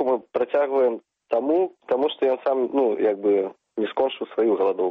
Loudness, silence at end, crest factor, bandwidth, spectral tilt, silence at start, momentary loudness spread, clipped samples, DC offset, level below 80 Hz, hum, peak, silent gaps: -23 LUFS; 0 s; 12 dB; 4.9 kHz; -7.5 dB/octave; 0 s; 5 LU; under 0.1%; under 0.1%; -72 dBFS; none; -10 dBFS; none